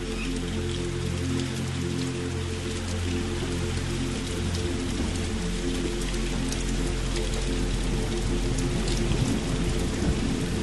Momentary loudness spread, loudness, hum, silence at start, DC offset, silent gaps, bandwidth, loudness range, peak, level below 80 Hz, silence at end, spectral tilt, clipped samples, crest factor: 3 LU; -29 LUFS; none; 0 s; 0.5%; none; 12 kHz; 2 LU; -12 dBFS; -32 dBFS; 0 s; -5 dB/octave; under 0.1%; 16 dB